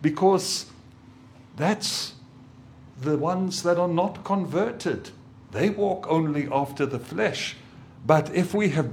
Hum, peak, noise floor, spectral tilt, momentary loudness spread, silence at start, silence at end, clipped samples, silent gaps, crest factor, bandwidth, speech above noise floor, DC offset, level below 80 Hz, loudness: none; -4 dBFS; -49 dBFS; -5 dB/octave; 12 LU; 0 s; 0 s; under 0.1%; none; 22 dB; 17 kHz; 25 dB; under 0.1%; -62 dBFS; -25 LUFS